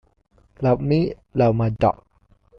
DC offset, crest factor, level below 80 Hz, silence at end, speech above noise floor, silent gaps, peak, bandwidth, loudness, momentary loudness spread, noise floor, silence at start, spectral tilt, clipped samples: under 0.1%; 16 dB; -44 dBFS; 0.65 s; 38 dB; none; -6 dBFS; 6 kHz; -21 LUFS; 6 LU; -58 dBFS; 0.6 s; -10 dB/octave; under 0.1%